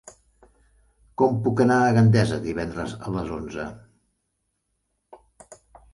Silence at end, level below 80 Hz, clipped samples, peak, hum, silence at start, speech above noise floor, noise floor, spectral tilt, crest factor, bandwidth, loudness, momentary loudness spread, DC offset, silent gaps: 0.4 s; -50 dBFS; under 0.1%; -6 dBFS; none; 0.05 s; 54 dB; -76 dBFS; -7.5 dB/octave; 18 dB; 11.5 kHz; -22 LUFS; 16 LU; under 0.1%; none